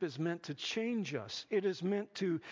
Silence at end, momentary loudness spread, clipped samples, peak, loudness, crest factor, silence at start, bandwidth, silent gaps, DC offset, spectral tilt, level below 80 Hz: 0 s; 4 LU; under 0.1%; -22 dBFS; -37 LUFS; 14 dB; 0 s; 7.6 kHz; none; under 0.1%; -5.5 dB/octave; -82 dBFS